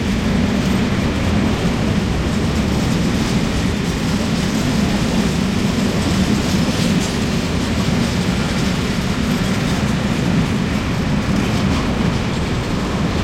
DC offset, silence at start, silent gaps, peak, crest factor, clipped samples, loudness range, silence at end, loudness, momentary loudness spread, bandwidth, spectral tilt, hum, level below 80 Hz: under 0.1%; 0 s; none; -6 dBFS; 12 dB; under 0.1%; 1 LU; 0 s; -18 LUFS; 2 LU; 16 kHz; -5.5 dB/octave; none; -28 dBFS